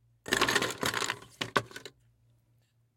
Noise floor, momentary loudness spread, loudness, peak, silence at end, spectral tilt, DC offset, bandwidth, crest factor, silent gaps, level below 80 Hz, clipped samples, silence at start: -70 dBFS; 19 LU; -30 LUFS; -8 dBFS; 1.1 s; -2 dB/octave; under 0.1%; 17 kHz; 26 dB; none; -62 dBFS; under 0.1%; 0.3 s